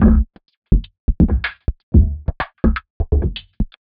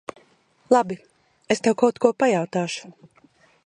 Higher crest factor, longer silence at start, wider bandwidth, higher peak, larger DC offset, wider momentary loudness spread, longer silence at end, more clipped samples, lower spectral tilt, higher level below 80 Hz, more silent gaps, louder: second, 16 dB vs 22 dB; second, 0 s vs 0.7 s; second, 4.9 kHz vs 10.5 kHz; about the same, 0 dBFS vs -2 dBFS; neither; second, 11 LU vs 14 LU; second, 0.2 s vs 0.75 s; neither; first, -7.5 dB/octave vs -5 dB/octave; first, -20 dBFS vs -68 dBFS; first, 0.57-0.62 s, 0.99-1.08 s, 1.83-1.92 s, 2.90-3.00 s vs none; about the same, -20 LUFS vs -22 LUFS